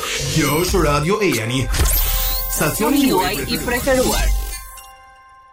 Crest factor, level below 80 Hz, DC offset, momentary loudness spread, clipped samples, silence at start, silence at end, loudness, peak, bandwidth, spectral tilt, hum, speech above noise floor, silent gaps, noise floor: 12 dB; -24 dBFS; under 0.1%; 7 LU; under 0.1%; 0 s; 0.55 s; -18 LUFS; -6 dBFS; 16.5 kHz; -4 dB/octave; none; 28 dB; none; -45 dBFS